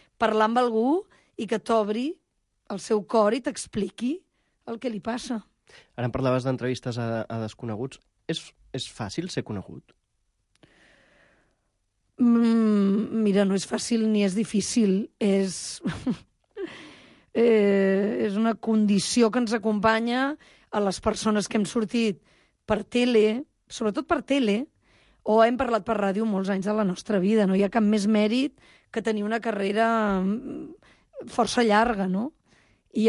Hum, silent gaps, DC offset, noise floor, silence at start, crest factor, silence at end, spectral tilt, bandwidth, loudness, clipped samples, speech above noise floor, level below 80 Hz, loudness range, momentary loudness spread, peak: none; none; under 0.1%; -74 dBFS; 0.2 s; 18 dB; 0 s; -5.5 dB/octave; 11.5 kHz; -25 LUFS; under 0.1%; 50 dB; -56 dBFS; 8 LU; 15 LU; -8 dBFS